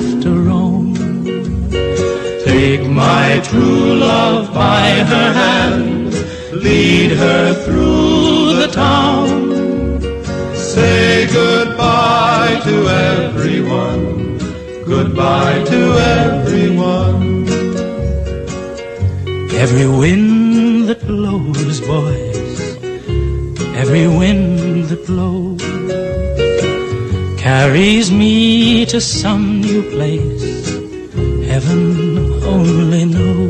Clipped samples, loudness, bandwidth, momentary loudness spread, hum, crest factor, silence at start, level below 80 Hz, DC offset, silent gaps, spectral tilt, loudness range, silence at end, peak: under 0.1%; -13 LUFS; 10 kHz; 9 LU; none; 10 dB; 0 s; -28 dBFS; under 0.1%; none; -6 dB/octave; 4 LU; 0 s; -2 dBFS